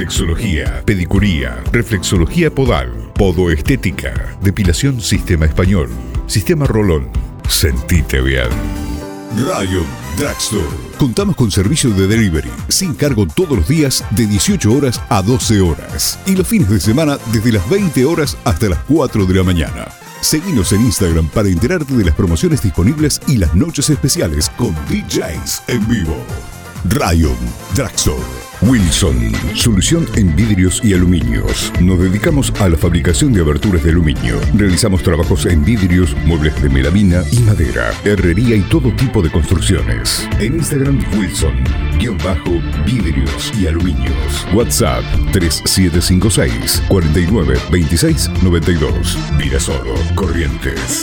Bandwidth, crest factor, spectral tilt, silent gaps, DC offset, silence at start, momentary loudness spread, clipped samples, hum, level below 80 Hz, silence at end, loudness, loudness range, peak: over 20 kHz; 14 dB; -5 dB/octave; none; under 0.1%; 0 s; 6 LU; under 0.1%; none; -20 dBFS; 0 s; -14 LUFS; 3 LU; 0 dBFS